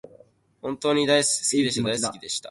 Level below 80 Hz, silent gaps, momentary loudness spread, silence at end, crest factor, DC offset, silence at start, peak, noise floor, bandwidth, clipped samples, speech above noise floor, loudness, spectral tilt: -62 dBFS; none; 12 LU; 0 s; 20 dB; under 0.1%; 0.05 s; -6 dBFS; -55 dBFS; 11.5 kHz; under 0.1%; 32 dB; -23 LUFS; -3 dB/octave